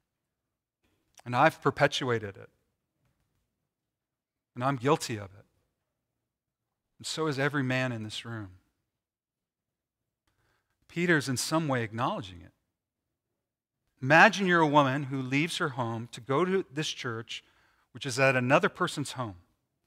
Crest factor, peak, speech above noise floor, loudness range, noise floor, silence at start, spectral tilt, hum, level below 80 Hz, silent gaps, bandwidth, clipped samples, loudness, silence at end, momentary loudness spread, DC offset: 26 dB; -6 dBFS; over 62 dB; 10 LU; under -90 dBFS; 1.25 s; -5 dB/octave; none; -72 dBFS; none; 16 kHz; under 0.1%; -28 LUFS; 0.5 s; 17 LU; under 0.1%